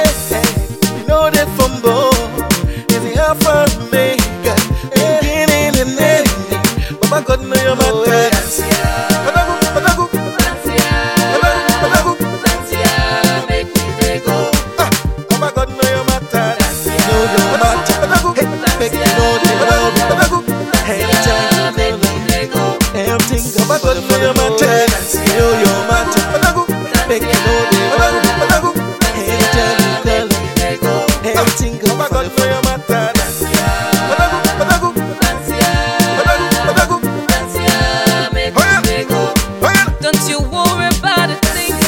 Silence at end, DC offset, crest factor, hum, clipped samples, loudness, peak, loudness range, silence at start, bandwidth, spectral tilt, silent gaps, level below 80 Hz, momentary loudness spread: 0 s; 0.1%; 12 dB; none; under 0.1%; -13 LUFS; 0 dBFS; 2 LU; 0 s; 17 kHz; -4 dB/octave; none; -24 dBFS; 4 LU